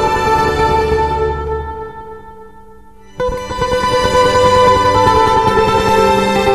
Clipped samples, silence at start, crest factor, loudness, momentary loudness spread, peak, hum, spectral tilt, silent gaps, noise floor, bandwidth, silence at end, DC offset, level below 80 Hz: under 0.1%; 0 s; 14 dB; -12 LUFS; 12 LU; 0 dBFS; none; -5 dB/octave; none; -41 dBFS; 15 kHz; 0 s; 1%; -28 dBFS